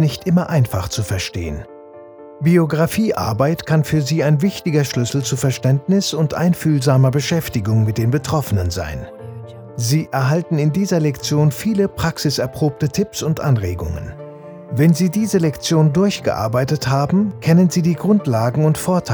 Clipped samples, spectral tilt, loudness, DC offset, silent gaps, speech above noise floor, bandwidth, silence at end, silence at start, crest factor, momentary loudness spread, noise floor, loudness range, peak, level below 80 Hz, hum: under 0.1%; -6 dB/octave; -17 LUFS; under 0.1%; none; 22 dB; over 20 kHz; 0 s; 0 s; 16 dB; 11 LU; -38 dBFS; 3 LU; -2 dBFS; -42 dBFS; none